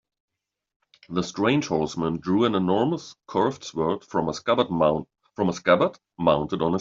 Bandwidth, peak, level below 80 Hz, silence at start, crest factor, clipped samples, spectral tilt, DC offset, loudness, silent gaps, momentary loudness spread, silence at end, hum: 7.8 kHz; -4 dBFS; -58 dBFS; 1.1 s; 20 dB; under 0.1%; -5 dB/octave; under 0.1%; -24 LUFS; none; 8 LU; 0 s; none